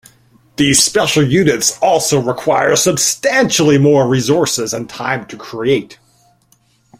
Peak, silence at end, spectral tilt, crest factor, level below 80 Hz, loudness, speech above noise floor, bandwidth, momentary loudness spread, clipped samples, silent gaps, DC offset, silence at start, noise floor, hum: 0 dBFS; 1.05 s; -3.5 dB/octave; 14 dB; -48 dBFS; -13 LUFS; 42 dB; 16.5 kHz; 10 LU; under 0.1%; none; under 0.1%; 0.6 s; -55 dBFS; none